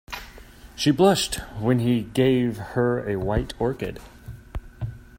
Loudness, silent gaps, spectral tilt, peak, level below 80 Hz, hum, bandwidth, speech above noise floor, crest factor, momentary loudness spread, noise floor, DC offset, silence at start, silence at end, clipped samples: -23 LUFS; none; -5.5 dB/octave; -6 dBFS; -40 dBFS; none; 16 kHz; 22 dB; 18 dB; 21 LU; -45 dBFS; under 0.1%; 0.1 s; 0 s; under 0.1%